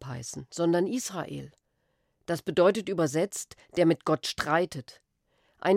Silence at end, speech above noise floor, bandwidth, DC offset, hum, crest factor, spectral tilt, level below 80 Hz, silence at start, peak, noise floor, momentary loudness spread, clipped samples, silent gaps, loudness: 0 s; 47 dB; 16 kHz; under 0.1%; none; 18 dB; -5 dB/octave; -64 dBFS; 0 s; -10 dBFS; -75 dBFS; 14 LU; under 0.1%; none; -28 LUFS